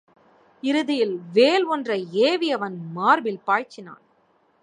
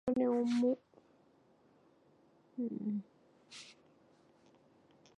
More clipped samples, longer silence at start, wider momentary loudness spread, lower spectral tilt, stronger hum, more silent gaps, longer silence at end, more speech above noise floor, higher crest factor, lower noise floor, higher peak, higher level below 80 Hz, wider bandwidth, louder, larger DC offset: neither; first, 0.65 s vs 0.05 s; second, 11 LU vs 20 LU; second, -5 dB/octave vs -6.5 dB/octave; neither; neither; second, 0.7 s vs 1.45 s; first, 41 dB vs 34 dB; about the same, 18 dB vs 18 dB; second, -63 dBFS vs -68 dBFS; first, -4 dBFS vs -22 dBFS; about the same, -80 dBFS vs -76 dBFS; about the same, 10.5 kHz vs 10 kHz; first, -22 LUFS vs -36 LUFS; neither